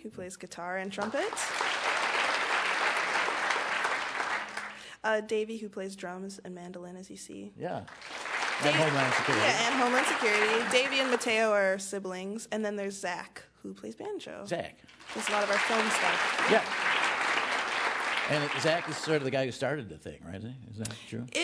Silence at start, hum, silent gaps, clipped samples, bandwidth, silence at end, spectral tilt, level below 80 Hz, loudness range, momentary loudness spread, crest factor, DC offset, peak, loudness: 0 s; none; none; under 0.1%; 11 kHz; 0 s; -3 dB/octave; -70 dBFS; 10 LU; 17 LU; 20 dB; under 0.1%; -10 dBFS; -29 LUFS